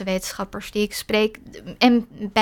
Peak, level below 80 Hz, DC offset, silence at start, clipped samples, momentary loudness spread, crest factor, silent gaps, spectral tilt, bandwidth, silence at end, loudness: -4 dBFS; -48 dBFS; under 0.1%; 0 s; under 0.1%; 13 LU; 20 dB; none; -4 dB/octave; 18 kHz; 0 s; -22 LUFS